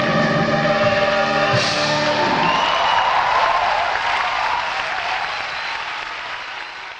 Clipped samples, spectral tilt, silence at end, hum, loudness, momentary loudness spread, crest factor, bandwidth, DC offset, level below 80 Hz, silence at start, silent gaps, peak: under 0.1%; -4 dB/octave; 0 s; none; -18 LUFS; 9 LU; 16 dB; 9.8 kHz; under 0.1%; -50 dBFS; 0 s; none; -4 dBFS